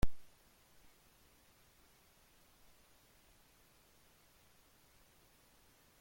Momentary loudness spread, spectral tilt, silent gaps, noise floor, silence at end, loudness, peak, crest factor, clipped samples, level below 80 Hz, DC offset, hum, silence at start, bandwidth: 0 LU; -5.5 dB/octave; none; -68 dBFS; 5.8 s; -62 LUFS; -18 dBFS; 24 dB; under 0.1%; -54 dBFS; under 0.1%; none; 0.05 s; 16.5 kHz